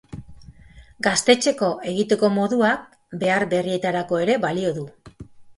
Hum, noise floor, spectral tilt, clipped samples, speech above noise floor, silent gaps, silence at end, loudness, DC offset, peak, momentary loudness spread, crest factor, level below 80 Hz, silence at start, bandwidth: none; -47 dBFS; -4 dB/octave; under 0.1%; 27 dB; none; 0.05 s; -21 LUFS; under 0.1%; -2 dBFS; 13 LU; 20 dB; -54 dBFS; 0.1 s; 11.5 kHz